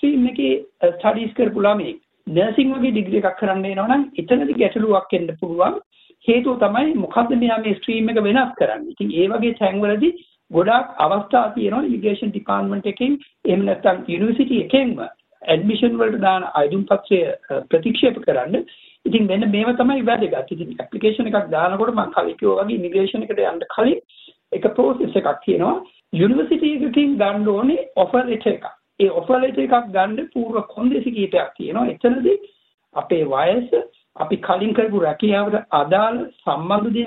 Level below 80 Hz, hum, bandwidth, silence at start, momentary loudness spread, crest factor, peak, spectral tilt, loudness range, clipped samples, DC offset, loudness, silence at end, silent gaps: -58 dBFS; none; 4.1 kHz; 0.05 s; 7 LU; 18 dB; -2 dBFS; -9.5 dB/octave; 2 LU; under 0.1%; under 0.1%; -19 LUFS; 0 s; 5.86-5.91 s, 32.74-32.78 s